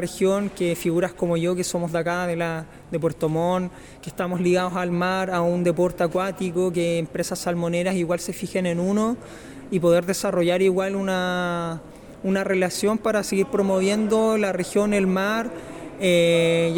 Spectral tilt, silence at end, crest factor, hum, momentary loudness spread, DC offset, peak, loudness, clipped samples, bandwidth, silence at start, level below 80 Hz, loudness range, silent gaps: -5.5 dB/octave; 0 s; 14 dB; none; 9 LU; under 0.1%; -8 dBFS; -23 LUFS; under 0.1%; 18 kHz; 0 s; -52 dBFS; 3 LU; none